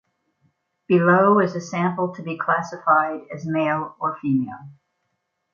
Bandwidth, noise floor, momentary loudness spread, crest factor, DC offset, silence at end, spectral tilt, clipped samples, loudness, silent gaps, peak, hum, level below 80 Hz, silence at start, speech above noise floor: 7.4 kHz; -75 dBFS; 11 LU; 18 dB; under 0.1%; 0.8 s; -7.5 dB/octave; under 0.1%; -21 LUFS; none; -4 dBFS; none; -68 dBFS; 0.9 s; 54 dB